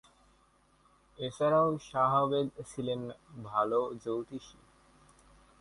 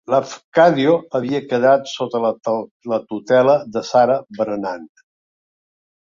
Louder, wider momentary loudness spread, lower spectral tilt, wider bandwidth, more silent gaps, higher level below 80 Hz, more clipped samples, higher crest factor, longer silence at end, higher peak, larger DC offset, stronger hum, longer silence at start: second, -32 LUFS vs -18 LUFS; first, 16 LU vs 10 LU; about the same, -6.5 dB/octave vs -6 dB/octave; first, 11.5 kHz vs 7.6 kHz; second, none vs 0.44-0.52 s, 2.71-2.80 s; about the same, -66 dBFS vs -64 dBFS; neither; about the same, 18 dB vs 16 dB; about the same, 1.1 s vs 1.15 s; second, -16 dBFS vs -2 dBFS; neither; neither; first, 1.2 s vs 0.1 s